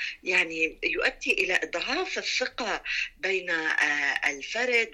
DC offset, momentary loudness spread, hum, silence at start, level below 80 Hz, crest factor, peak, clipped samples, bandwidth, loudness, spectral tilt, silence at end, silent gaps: under 0.1%; 5 LU; none; 0 s; -58 dBFS; 16 dB; -12 dBFS; under 0.1%; 14.5 kHz; -26 LUFS; -1 dB/octave; 0 s; none